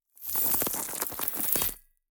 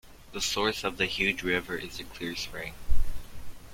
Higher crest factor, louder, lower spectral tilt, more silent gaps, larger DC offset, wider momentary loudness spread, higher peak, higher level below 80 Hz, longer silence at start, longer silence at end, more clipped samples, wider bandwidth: first, 24 dB vs 18 dB; first, -27 LUFS vs -31 LUFS; second, -1.5 dB/octave vs -3 dB/octave; neither; neither; second, 6 LU vs 16 LU; first, -6 dBFS vs -10 dBFS; second, -56 dBFS vs -36 dBFS; first, 0.2 s vs 0.05 s; first, 0.3 s vs 0 s; neither; first, over 20 kHz vs 16 kHz